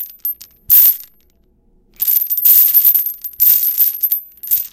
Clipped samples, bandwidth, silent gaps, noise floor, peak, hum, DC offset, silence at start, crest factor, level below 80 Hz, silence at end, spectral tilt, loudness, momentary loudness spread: under 0.1%; 18.5 kHz; none; -55 dBFS; 0 dBFS; none; under 0.1%; 0 s; 14 dB; -54 dBFS; 0.05 s; 1.5 dB/octave; -10 LUFS; 15 LU